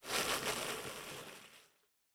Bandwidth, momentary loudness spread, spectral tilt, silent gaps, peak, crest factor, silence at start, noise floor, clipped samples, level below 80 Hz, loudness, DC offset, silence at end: over 20 kHz; 19 LU; -1 dB/octave; none; -20 dBFS; 24 dB; 0 s; -74 dBFS; under 0.1%; -68 dBFS; -39 LUFS; under 0.1%; 0.5 s